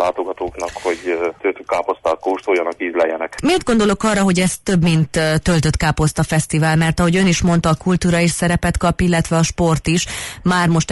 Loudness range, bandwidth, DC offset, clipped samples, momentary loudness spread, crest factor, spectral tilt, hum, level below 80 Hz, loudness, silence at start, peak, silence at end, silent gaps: 3 LU; 12 kHz; under 0.1%; under 0.1%; 6 LU; 12 dB; -5.5 dB/octave; none; -34 dBFS; -17 LUFS; 0 s; -4 dBFS; 0 s; none